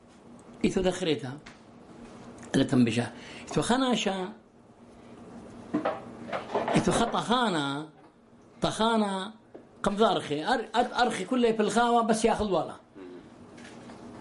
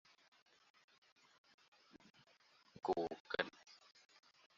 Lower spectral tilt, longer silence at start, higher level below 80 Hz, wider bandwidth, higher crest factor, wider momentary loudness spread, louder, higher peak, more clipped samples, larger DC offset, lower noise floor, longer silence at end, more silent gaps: first, -5 dB/octave vs -2 dB/octave; second, 0.3 s vs 1.95 s; first, -54 dBFS vs -82 dBFS; first, 11.5 kHz vs 7.2 kHz; second, 20 dB vs 32 dB; second, 21 LU vs 25 LU; first, -28 LUFS vs -44 LUFS; first, -10 dBFS vs -18 dBFS; neither; neither; second, -56 dBFS vs -72 dBFS; second, 0 s vs 0.85 s; second, none vs 2.10-2.14 s, 3.20-3.25 s